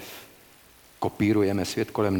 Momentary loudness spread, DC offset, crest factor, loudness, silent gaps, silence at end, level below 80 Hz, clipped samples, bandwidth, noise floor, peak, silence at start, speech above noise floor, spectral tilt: 17 LU; under 0.1%; 16 dB; -26 LUFS; none; 0 s; -58 dBFS; under 0.1%; 19 kHz; -54 dBFS; -12 dBFS; 0 s; 30 dB; -6 dB/octave